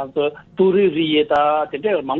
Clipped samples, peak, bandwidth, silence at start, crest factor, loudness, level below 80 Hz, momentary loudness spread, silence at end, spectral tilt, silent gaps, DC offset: under 0.1%; -4 dBFS; 4.3 kHz; 0 s; 12 dB; -18 LUFS; -56 dBFS; 7 LU; 0 s; -8 dB/octave; none; under 0.1%